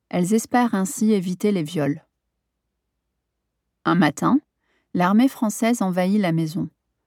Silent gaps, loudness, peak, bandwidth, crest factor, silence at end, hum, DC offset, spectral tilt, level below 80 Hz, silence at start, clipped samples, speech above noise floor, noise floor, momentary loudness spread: none; -21 LUFS; -6 dBFS; 16.5 kHz; 18 dB; 0.4 s; none; under 0.1%; -6 dB/octave; -70 dBFS; 0.15 s; under 0.1%; 58 dB; -78 dBFS; 8 LU